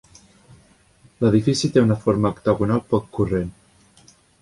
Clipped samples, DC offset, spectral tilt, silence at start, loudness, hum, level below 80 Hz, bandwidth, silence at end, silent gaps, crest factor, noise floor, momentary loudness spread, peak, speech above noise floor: under 0.1%; under 0.1%; -6.5 dB/octave; 1.2 s; -20 LUFS; none; -46 dBFS; 11.5 kHz; 0.9 s; none; 18 dB; -55 dBFS; 6 LU; -4 dBFS; 35 dB